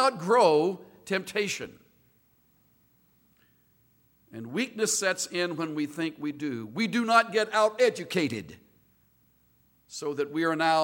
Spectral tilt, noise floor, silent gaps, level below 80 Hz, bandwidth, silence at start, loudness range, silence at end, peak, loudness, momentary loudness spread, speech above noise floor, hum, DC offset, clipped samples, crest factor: -3.5 dB/octave; -66 dBFS; none; -74 dBFS; 17 kHz; 0 s; 10 LU; 0 s; -6 dBFS; -27 LUFS; 14 LU; 39 dB; none; under 0.1%; under 0.1%; 22 dB